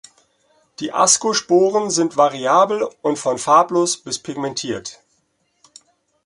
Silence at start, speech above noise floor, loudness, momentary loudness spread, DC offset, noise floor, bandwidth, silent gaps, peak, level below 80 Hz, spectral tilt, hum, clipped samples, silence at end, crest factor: 0.8 s; 49 dB; -17 LUFS; 12 LU; under 0.1%; -66 dBFS; 11.5 kHz; none; 0 dBFS; -64 dBFS; -3 dB/octave; none; under 0.1%; 1.35 s; 20 dB